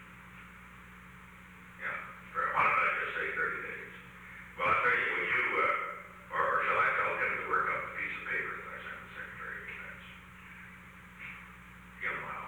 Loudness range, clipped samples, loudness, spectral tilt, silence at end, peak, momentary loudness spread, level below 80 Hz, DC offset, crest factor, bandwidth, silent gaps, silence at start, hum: 13 LU; under 0.1%; -32 LUFS; -4.5 dB/octave; 0 s; -16 dBFS; 23 LU; -62 dBFS; under 0.1%; 20 dB; over 20 kHz; none; 0 s; none